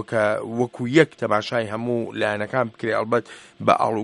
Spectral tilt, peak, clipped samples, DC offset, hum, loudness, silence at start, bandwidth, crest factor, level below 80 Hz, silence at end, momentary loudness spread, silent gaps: -6 dB/octave; 0 dBFS; under 0.1%; under 0.1%; none; -22 LUFS; 0 s; 11.5 kHz; 22 dB; -64 dBFS; 0 s; 7 LU; none